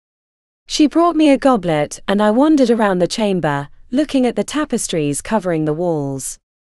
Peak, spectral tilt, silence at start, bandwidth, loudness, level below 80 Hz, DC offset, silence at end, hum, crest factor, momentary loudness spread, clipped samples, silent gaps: 0 dBFS; -5 dB/octave; 0.7 s; 13.5 kHz; -16 LUFS; -44 dBFS; under 0.1%; 0.4 s; none; 16 dB; 10 LU; under 0.1%; none